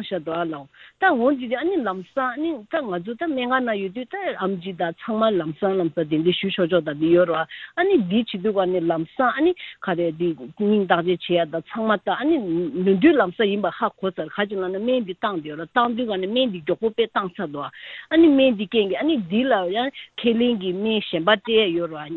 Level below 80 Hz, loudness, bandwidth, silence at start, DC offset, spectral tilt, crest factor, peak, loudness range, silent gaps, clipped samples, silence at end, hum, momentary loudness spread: -60 dBFS; -22 LUFS; 4.3 kHz; 0 s; under 0.1%; -9 dB/octave; 20 dB; -2 dBFS; 4 LU; none; under 0.1%; 0 s; none; 9 LU